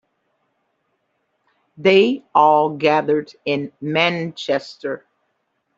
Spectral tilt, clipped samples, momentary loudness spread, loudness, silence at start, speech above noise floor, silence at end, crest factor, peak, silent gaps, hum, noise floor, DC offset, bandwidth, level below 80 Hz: -6 dB/octave; under 0.1%; 13 LU; -18 LUFS; 1.8 s; 53 dB; 0.8 s; 18 dB; -2 dBFS; none; none; -70 dBFS; under 0.1%; 7.6 kHz; -66 dBFS